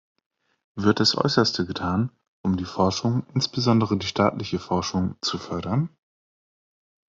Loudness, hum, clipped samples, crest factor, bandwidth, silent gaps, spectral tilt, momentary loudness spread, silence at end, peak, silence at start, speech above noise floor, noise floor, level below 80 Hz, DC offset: -24 LUFS; none; under 0.1%; 20 dB; 7.8 kHz; 2.28-2.44 s; -5.5 dB/octave; 9 LU; 1.2 s; -4 dBFS; 0.75 s; over 67 dB; under -90 dBFS; -60 dBFS; under 0.1%